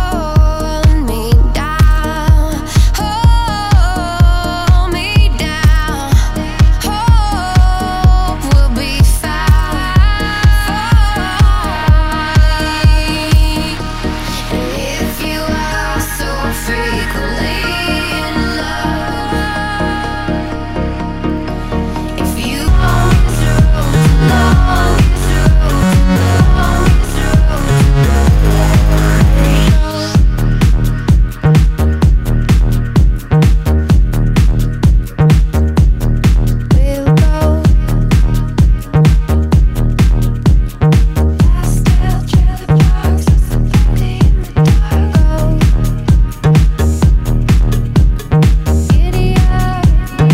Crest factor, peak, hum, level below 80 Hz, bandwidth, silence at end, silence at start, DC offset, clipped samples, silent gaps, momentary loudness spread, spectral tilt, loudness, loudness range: 10 dB; 0 dBFS; none; -12 dBFS; 16 kHz; 0 s; 0 s; under 0.1%; 0.3%; none; 6 LU; -6 dB/octave; -12 LUFS; 5 LU